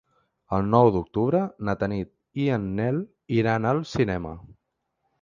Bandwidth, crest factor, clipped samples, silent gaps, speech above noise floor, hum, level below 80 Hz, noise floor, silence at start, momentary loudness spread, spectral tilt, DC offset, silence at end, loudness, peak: 7.4 kHz; 22 dB; under 0.1%; none; 54 dB; none; -48 dBFS; -77 dBFS; 0.5 s; 12 LU; -8.5 dB/octave; under 0.1%; 0.75 s; -25 LUFS; -4 dBFS